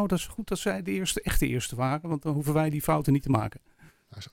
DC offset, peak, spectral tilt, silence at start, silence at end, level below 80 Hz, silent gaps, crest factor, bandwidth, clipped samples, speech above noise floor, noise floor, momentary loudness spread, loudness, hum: under 0.1%; -8 dBFS; -5.5 dB/octave; 0 s; 0.05 s; -40 dBFS; none; 20 dB; 17 kHz; under 0.1%; 21 dB; -48 dBFS; 6 LU; -28 LUFS; none